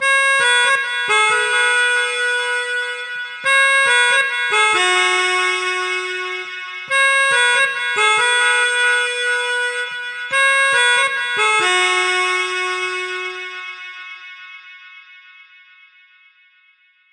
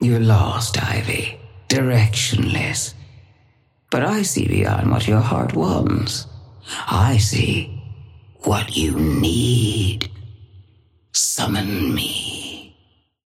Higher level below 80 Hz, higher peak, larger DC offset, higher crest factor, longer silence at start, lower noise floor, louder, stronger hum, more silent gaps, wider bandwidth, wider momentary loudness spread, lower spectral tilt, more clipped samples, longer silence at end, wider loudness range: second, -78 dBFS vs -38 dBFS; about the same, -2 dBFS vs -4 dBFS; neither; about the same, 16 dB vs 16 dB; about the same, 0 s vs 0 s; second, -55 dBFS vs -60 dBFS; first, -15 LUFS vs -19 LUFS; neither; neither; second, 11.5 kHz vs 16 kHz; about the same, 13 LU vs 13 LU; second, 1 dB/octave vs -4.5 dB/octave; neither; first, 1.95 s vs 0.6 s; first, 9 LU vs 2 LU